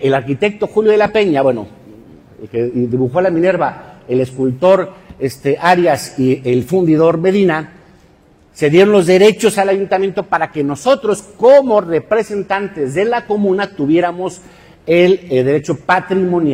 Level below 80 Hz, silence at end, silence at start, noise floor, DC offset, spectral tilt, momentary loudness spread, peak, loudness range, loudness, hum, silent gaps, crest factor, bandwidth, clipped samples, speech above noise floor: -52 dBFS; 0 s; 0 s; -48 dBFS; under 0.1%; -6 dB/octave; 10 LU; 0 dBFS; 3 LU; -14 LUFS; none; none; 14 dB; 16 kHz; under 0.1%; 35 dB